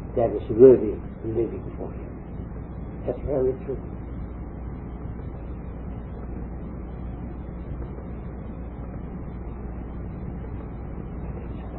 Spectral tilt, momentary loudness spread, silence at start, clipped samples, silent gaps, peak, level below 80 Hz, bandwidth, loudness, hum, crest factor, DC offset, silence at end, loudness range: -13 dB/octave; 11 LU; 0 s; under 0.1%; none; -2 dBFS; -36 dBFS; 3.8 kHz; -28 LUFS; none; 24 dB; under 0.1%; 0 s; 13 LU